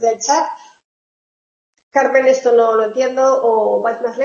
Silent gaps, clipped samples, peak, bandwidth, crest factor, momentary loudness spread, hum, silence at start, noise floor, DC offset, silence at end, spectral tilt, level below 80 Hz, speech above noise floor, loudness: 0.84-1.73 s, 1.83-1.91 s; under 0.1%; -2 dBFS; 7.4 kHz; 14 dB; 7 LU; none; 0 s; under -90 dBFS; under 0.1%; 0 s; -2.5 dB/octave; -72 dBFS; over 76 dB; -14 LUFS